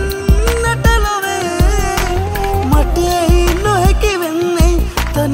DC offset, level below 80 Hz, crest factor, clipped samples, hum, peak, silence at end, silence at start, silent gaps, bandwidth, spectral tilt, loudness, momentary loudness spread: 0.2%; -16 dBFS; 12 dB; under 0.1%; none; 0 dBFS; 0 s; 0 s; none; 16.5 kHz; -5 dB/octave; -14 LUFS; 4 LU